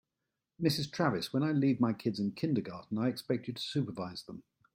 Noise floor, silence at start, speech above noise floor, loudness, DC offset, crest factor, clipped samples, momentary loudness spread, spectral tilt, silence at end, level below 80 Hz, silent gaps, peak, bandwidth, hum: -88 dBFS; 0.6 s; 55 dB; -33 LUFS; under 0.1%; 18 dB; under 0.1%; 11 LU; -6.5 dB/octave; 0.35 s; -70 dBFS; none; -14 dBFS; 16 kHz; none